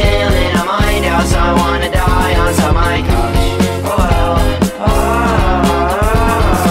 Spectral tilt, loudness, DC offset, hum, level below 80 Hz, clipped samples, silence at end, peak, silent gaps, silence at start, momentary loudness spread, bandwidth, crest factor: -5.5 dB/octave; -13 LUFS; under 0.1%; none; -16 dBFS; under 0.1%; 0 s; 0 dBFS; none; 0 s; 2 LU; 16.5 kHz; 12 dB